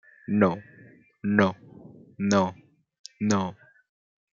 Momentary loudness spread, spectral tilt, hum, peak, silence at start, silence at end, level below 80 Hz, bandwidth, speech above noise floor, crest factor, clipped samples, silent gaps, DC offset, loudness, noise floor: 17 LU; -6 dB/octave; none; -4 dBFS; 0.3 s; 0.85 s; -68 dBFS; 7.6 kHz; 30 dB; 24 dB; under 0.1%; 2.99-3.04 s; under 0.1%; -26 LUFS; -54 dBFS